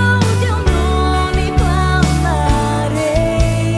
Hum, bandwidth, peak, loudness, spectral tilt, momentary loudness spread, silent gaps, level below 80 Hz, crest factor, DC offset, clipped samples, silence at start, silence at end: none; 11 kHz; -2 dBFS; -15 LUFS; -6 dB/octave; 2 LU; none; -18 dBFS; 12 dB; under 0.1%; under 0.1%; 0 s; 0 s